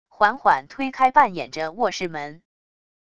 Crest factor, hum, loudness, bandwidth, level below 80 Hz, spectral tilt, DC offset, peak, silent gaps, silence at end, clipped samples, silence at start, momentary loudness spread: 20 dB; none; -21 LUFS; 8.6 kHz; -60 dBFS; -4 dB/octave; under 0.1%; -2 dBFS; none; 0.8 s; under 0.1%; 0.2 s; 13 LU